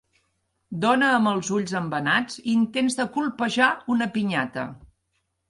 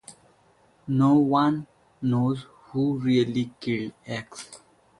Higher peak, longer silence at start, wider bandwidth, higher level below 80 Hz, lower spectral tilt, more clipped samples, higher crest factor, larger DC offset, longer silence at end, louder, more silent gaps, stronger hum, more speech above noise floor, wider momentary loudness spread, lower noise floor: first, -6 dBFS vs -10 dBFS; first, 0.7 s vs 0.1 s; about the same, 11.5 kHz vs 11.5 kHz; about the same, -62 dBFS vs -62 dBFS; second, -4.5 dB/octave vs -7 dB/octave; neither; about the same, 18 dB vs 16 dB; neither; first, 0.65 s vs 0.45 s; about the same, -23 LUFS vs -25 LUFS; neither; neither; first, 51 dB vs 37 dB; second, 7 LU vs 16 LU; first, -74 dBFS vs -61 dBFS